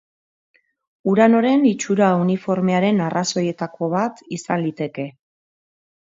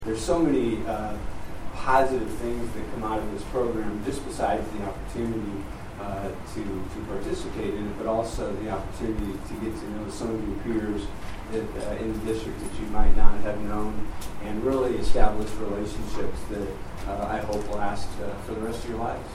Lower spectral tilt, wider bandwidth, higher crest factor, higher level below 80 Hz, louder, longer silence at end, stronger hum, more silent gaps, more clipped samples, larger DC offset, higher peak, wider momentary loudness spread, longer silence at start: about the same, -6 dB/octave vs -6 dB/octave; second, 7.8 kHz vs 12 kHz; about the same, 20 dB vs 22 dB; second, -66 dBFS vs -32 dBFS; first, -19 LUFS vs -30 LUFS; first, 1.05 s vs 0 s; neither; neither; neither; neither; about the same, 0 dBFS vs -2 dBFS; first, 12 LU vs 9 LU; first, 1.05 s vs 0 s